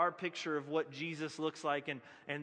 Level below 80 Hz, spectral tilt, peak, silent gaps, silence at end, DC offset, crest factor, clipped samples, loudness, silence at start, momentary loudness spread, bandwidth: -90 dBFS; -4.5 dB/octave; -20 dBFS; none; 0 s; under 0.1%; 20 dB; under 0.1%; -39 LUFS; 0 s; 7 LU; 10 kHz